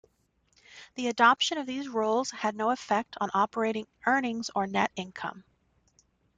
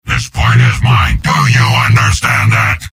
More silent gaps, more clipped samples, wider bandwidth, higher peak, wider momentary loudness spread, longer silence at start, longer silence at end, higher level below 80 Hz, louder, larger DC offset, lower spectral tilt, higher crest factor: neither; neither; second, 9.4 kHz vs 16 kHz; second, -8 dBFS vs 0 dBFS; first, 12 LU vs 3 LU; first, 0.7 s vs 0.05 s; first, 0.95 s vs 0.05 s; second, -72 dBFS vs -22 dBFS; second, -28 LUFS vs -10 LUFS; neither; about the same, -3.5 dB/octave vs -4.5 dB/octave; first, 22 dB vs 10 dB